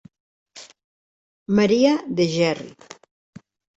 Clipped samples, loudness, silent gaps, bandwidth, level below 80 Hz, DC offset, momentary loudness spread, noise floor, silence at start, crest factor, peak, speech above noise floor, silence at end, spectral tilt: under 0.1%; -20 LUFS; 0.84-1.46 s; 8 kHz; -60 dBFS; under 0.1%; 26 LU; under -90 dBFS; 0.55 s; 18 dB; -4 dBFS; over 71 dB; 1.05 s; -5.5 dB/octave